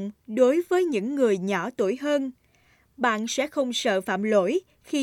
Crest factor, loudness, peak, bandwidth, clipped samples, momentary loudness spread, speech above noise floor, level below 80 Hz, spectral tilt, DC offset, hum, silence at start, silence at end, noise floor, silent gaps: 16 dB; -25 LUFS; -8 dBFS; 17 kHz; under 0.1%; 6 LU; 38 dB; -70 dBFS; -4.5 dB/octave; under 0.1%; none; 0 s; 0 s; -62 dBFS; none